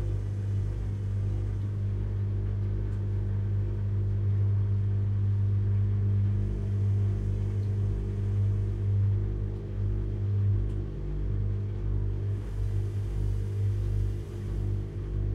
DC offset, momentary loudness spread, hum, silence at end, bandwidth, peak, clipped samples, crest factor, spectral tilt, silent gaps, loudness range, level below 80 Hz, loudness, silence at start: under 0.1%; 6 LU; 50 Hz at -30 dBFS; 0 s; 3.6 kHz; -18 dBFS; under 0.1%; 10 dB; -9.5 dB/octave; none; 4 LU; -36 dBFS; -30 LUFS; 0 s